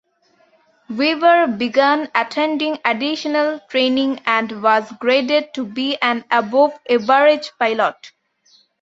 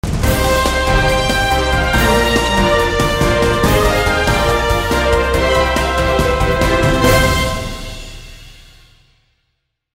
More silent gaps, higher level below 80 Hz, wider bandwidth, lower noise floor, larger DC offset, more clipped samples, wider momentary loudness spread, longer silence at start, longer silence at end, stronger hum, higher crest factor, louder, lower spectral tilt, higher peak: neither; second, -68 dBFS vs -22 dBFS; second, 7.8 kHz vs 16.5 kHz; second, -59 dBFS vs -69 dBFS; neither; neither; about the same, 6 LU vs 4 LU; first, 0.9 s vs 0.05 s; second, 0.75 s vs 1.45 s; neither; about the same, 18 dB vs 14 dB; second, -17 LUFS vs -14 LUFS; about the same, -4.5 dB/octave vs -4.5 dB/octave; about the same, 0 dBFS vs 0 dBFS